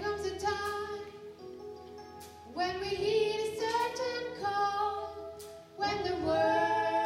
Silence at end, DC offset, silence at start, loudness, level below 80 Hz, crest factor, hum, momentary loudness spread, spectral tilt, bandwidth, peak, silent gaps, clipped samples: 0 s; under 0.1%; 0 s; -32 LUFS; -60 dBFS; 16 dB; none; 19 LU; -4 dB/octave; 16 kHz; -18 dBFS; none; under 0.1%